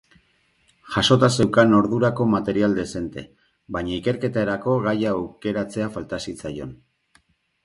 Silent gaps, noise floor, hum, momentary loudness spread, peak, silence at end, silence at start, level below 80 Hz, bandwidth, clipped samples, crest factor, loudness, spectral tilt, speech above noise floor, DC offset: none; -64 dBFS; none; 15 LU; -2 dBFS; 0.9 s; 0.85 s; -50 dBFS; 11.5 kHz; under 0.1%; 20 dB; -22 LUFS; -6 dB/octave; 42 dB; under 0.1%